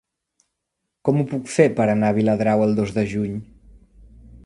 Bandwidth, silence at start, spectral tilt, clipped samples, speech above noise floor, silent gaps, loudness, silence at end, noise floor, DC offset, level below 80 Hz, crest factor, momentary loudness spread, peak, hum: 11.5 kHz; 1.05 s; -7.5 dB/octave; under 0.1%; 60 dB; none; -20 LUFS; 0.1 s; -79 dBFS; under 0.1%; -50 dBFS; 20 dB; 9 LU; 0 dBFS; none